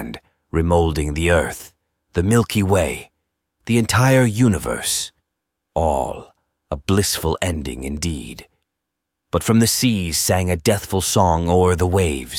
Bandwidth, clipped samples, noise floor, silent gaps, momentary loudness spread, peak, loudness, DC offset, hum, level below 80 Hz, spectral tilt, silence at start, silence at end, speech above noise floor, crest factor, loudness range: 17 kHz; under 0.1%; -80 dBFS; none; 14 LU; 0 dBFS; -19 LUFS; under 0.1%; none; -38 dBFS; -5 dB/octave; 0 s; 0 s; 61 dB; 20 dB; 5 LU